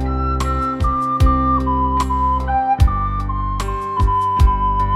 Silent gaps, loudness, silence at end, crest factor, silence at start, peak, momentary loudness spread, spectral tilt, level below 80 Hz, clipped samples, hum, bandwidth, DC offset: none; -18 LUFS; 0 s; 16 dB; 0 s; 0 dBFS; 7 LU; -7 dB/octave; -20 dBFS; under 0.1%; none; 13 kHz; under 0.1%